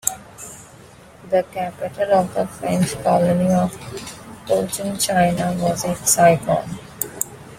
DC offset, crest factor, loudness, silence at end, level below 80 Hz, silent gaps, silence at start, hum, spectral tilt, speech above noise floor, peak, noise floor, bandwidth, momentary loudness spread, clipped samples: under 0.1%; 20 dB; -19 LUFS; 0 s; -50 dBFS; none; 0.05 s; none; -4.5 dB/octave; 25 dB; 0 dBFS; -44 dBFS; 16.5 kHz; 18 LU; under 0.1%